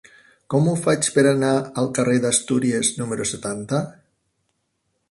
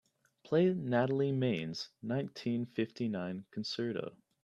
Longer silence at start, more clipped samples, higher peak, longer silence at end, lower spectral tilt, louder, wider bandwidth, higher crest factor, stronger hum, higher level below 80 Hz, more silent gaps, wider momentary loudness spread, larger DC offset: about the same, 0.5 s vs 0.45 s; neither; first, -4 dBFS vs -16 dBFS; first, 1.2 s vs 0.35 s; second, -4.5 dB/octave vs -7 dB/octave; first, -20 LUFS vs -35 LUFS; first, 11.5 kHz vs 8.6 kHz; about the same, 18 dB vs 18 dB; neither; first, -58 dBFS vs -76 dBFS; neither; second, 8 LU vs 11 LU; neither